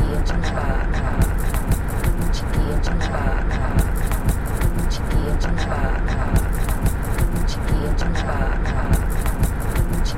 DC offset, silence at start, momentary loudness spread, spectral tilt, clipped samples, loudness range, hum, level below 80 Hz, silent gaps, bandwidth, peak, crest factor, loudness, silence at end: under 0.1%; 0 s; 2 LU; -6 dB/octave; under 0.1%; 0 LU; none; -20 dBFS; none; 16.5 kHz; -6 dBFS; 14 dB; -23 LUFS; 0 s